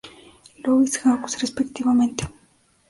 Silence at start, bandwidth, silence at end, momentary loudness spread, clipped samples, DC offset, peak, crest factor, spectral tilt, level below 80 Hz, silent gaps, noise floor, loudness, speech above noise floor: 0.05 s; 11.5 kHz; 0.6 s; 11 LU; under 0.1%; under 0.1%; -6 dBFS; 16 dB; -4 dB/octave; -52 dBFS; none; -60 dBFS; -22 LUFS; 40 dB